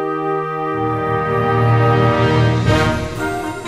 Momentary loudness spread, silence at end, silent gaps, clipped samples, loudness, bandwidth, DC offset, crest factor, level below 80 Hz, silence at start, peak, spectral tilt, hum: 7 LU; 0 s; none; under 0.1%; -16 LUFS; 12 kHz; under 0.1%; 14 dB; -34 dBFS; 0 s; -2 dBFS; -7 dB/octave; none